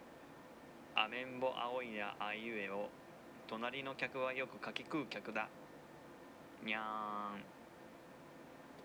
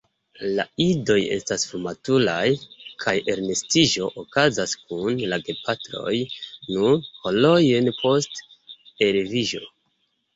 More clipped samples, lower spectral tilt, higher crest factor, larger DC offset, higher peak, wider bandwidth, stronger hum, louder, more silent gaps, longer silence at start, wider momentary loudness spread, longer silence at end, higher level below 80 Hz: neither; about the same, -4.5 dB/octave vs -4 dB/octave; first, 26 dB vs 20 dB; neither; second, -18 dBFS vs -2 dBFS; first, over 20 kHz vs 8.2 kHz; neither; second, -42 LUFS vs -22 LUFS; neither; second, 0 s vs 0.4 s; first, 17 LU vs 10 LU; second, 0 s vs 0.7 s; second, -80 dBFS vs -58 dBFS